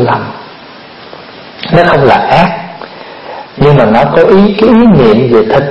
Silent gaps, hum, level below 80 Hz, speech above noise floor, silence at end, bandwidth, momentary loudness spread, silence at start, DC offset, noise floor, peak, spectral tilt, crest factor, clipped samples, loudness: none; none; -34 dBFS; 25 dB; 0 s; 7.4 kHz; 22 LU; 0 s; under 0.1%; -30 dBFS; 0 dBFS; -8.5 dB/octave; 8 dB; 2%; -6 LUFS